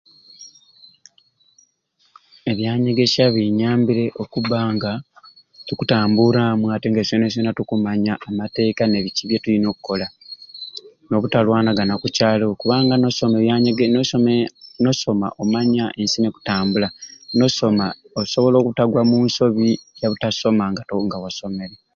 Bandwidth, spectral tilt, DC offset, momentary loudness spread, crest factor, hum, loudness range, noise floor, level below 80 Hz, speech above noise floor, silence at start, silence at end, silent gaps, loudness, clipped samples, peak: 7.4 kHz; -6 dB/octave; under 0.1%; 10 LU; 16 dB; none; 4 LU; -63 dBFS; -54 dBFS; 45 dB; 0.4 s; 0.2 s; none; -19 LUFS; under 0.1%; -2 dBFS